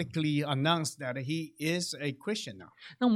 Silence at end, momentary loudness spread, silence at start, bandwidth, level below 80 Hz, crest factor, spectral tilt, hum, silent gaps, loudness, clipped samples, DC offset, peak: 0 s; 10 LU; 0 s; 16 kHz; -74 dBFS; 18 dB; -5 dB/octave; none; none; -32 LUFS; under 0.1%; under 0.1%; -14 dBFS